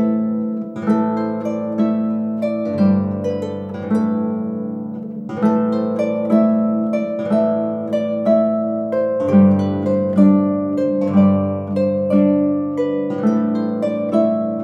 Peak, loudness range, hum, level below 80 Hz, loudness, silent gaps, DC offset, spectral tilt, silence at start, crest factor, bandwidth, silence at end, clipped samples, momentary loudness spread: -2 dBFS; 4 LU; none; -66 dBFS; -18 LUFS; none; under 0.1%; -10 dB/octave; 0 s; 16 dB; 6.4 kHz; 0 s; under 0.1%; 8 LU